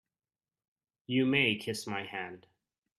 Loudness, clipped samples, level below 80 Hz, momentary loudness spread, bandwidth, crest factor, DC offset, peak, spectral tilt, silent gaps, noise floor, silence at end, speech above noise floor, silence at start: -31 LUFS; under 0.1%; -74 dBFS; 14 LU; 14 kHz; 22 dB; under 0.1%; -12 dBFS; -4.5 dB/octave; none; under -90 dBFS; 0.6 s; over 58 dB; 1.1 s